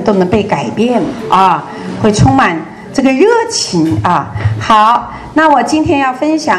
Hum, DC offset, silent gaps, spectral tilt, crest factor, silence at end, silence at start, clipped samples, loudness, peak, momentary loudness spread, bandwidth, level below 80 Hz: none; under 0.1%; none; -5.5 dB/octave; 10 dB; 0 s; 0 s; 0.7%; -11 LUFS; 0 dBFS; 8 LU; 12.5 kHz; -34 dBFS